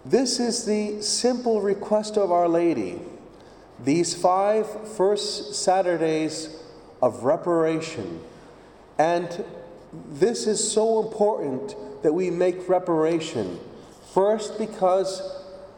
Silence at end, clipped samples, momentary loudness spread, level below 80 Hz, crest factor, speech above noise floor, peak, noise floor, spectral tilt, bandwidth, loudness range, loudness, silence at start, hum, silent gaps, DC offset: 0.05 s; under 0.1%; 15 LU; -62 dBFS; 18 dB; 25 dB; -6 dBFS; -48 dBFS; -4 dB/octave; 17.5 kHz; 3 LU; -24 LUFS; 0.05 s; none; none; under 0.1%